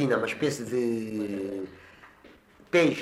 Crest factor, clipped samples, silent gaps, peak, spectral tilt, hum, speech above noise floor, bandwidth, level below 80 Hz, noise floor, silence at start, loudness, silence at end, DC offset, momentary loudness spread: 16 dB; under 0.1%; none; -12 dBFS; -5.5 dB/octave; none; 28 dB; 15.5 kHz; -66 dBFS; -55 dBFS; 0 s; -28 LUFS; 0 s; under 0.1%; 14 LU